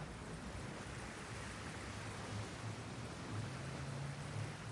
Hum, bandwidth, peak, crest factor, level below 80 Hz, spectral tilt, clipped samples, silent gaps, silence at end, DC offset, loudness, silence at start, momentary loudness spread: none; 11.5 kHz; -32 dBFS; 14 dB; -60 dBFS; -5 dB/octave; under 0.1%; none; 0 s; under 0.1%; -47 LUFS; 0 s; 2 LU